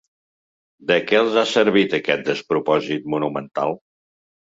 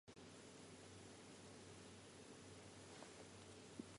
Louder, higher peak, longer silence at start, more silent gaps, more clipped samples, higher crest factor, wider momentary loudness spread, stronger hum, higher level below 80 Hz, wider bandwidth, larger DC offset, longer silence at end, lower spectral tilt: first, -20 LUFS vs -60 LUFS; first, -4 dBFS vs -38 dBFS; first, 0.85 s vs 0.05 s; neither; neither; about the same, 18 dB vs 22 dB; first, 8 LU vs 2 LU; neither; first, -64 dBFS vs -78 dBFS; second, 7.8 kHz vs 11.5 kHz; neither; first, 0.7 s vs 0 s; about the same, -5 dB/octave vs -4 dB/octave